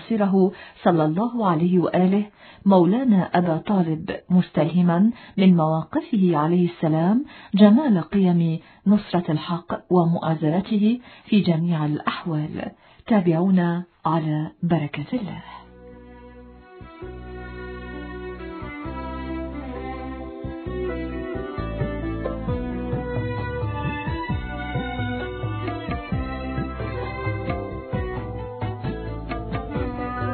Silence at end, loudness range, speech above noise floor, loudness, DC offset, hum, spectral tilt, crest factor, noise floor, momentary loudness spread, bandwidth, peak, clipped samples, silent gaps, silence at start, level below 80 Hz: 0 s; 13 LU; 24 dB; -23 LUFS; under 0.1%; none; -12 dB/octave; 22 dB; -44 dBFS; 14 LU; 4.5 kHz; -2 dBFS; under 0.1%; none; 0 s; -40 dBFS